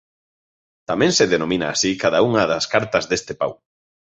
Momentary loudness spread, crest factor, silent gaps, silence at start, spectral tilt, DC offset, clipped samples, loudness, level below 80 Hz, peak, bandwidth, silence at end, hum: 10 LU; 18 dB; none; 0.9 s; -3.5 dB/octave; under 0.1%; under 0.1%; -19 LUFS; -52 dBFS; -2 dBFS; 8.4 kHz; 0.65 s; none